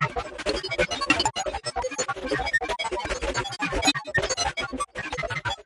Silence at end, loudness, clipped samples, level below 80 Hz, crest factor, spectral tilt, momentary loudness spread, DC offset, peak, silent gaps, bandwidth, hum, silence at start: 0.05 s; -26 LUFS; under 0.1%; -42 dBFS; 20 dB; -2.5 dB/octave; 8 LU; under 0.1%; -6 dBFS; none; 11.5 kHz; none; 0 s